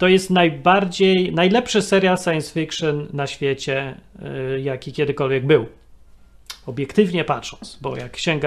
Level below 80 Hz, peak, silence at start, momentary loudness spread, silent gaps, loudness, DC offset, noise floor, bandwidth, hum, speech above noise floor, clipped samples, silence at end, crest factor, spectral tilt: -50 dBFS; 0 dBFS; 0 s; 15 LU; none; -19 LUFS; under 0.1%; -46 dBFS; 13 kHz; none; 27 dB; under 0.1%; 0 s; 20 dB; -5.5 dB/octave